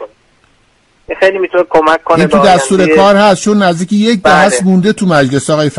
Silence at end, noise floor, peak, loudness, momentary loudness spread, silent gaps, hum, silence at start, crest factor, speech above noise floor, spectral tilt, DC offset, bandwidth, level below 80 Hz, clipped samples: 0 s; -51 dBFS; 0 dBFS; -9 LUFS; 5 LU; none; none; 0 s; 10 dB; 43 dB; -5 dB/octave; under 0.1%; 11.5 kHz; -42 dBFS; 0.3%